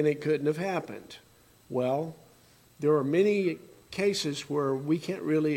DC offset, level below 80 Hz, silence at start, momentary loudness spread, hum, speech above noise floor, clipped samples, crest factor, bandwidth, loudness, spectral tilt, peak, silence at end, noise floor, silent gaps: under 0.1%; -70 dBFS; 0 s; 16 LU; none; 31 dB; under 0.1%; 16 dB; 17 kHz; -29 LUFS; -6 dB/octave; -12 dBFS; 0 s; -59 dBFS; none